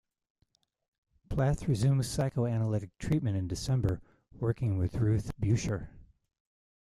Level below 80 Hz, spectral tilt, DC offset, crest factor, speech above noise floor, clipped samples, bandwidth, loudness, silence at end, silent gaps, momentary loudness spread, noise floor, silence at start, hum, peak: -48 dBFS; -7 dB/octave; under 0.1%; 16 dB; 45 dB; under 0.1%; 13 kHz; -31 LUFS; 0.85 s; none; 7 LU; -75 dBFS; 1.3 s; none; -16 dBFS